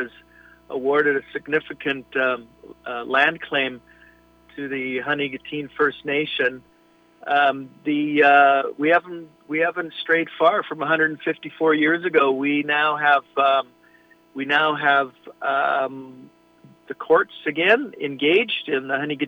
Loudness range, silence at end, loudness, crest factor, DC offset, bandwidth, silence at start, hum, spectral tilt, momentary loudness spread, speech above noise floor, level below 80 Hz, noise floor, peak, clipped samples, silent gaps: 5 LU; 0 s; -21 LUFS; 20 dB; under 0.1%; 6.4 kHz; 0 s; 60 Hz at -65 dBFS; -6 dB/octave; 13 LU; 35 dB; -66 dBFS; -56 dBFS; -2 dBFS; under 0.1%; none